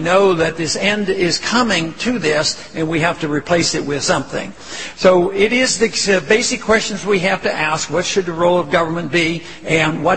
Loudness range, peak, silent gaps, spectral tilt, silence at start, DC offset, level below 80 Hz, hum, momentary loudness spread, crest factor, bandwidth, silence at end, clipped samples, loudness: 2 LU; 0 dBFS; none; -3.5 dB/octave; 0 s; 1%; -46 dBFS; none; 6 LU; 16 dB; 8.8 kHz; 0 s; under 0.1%; -16 LUFS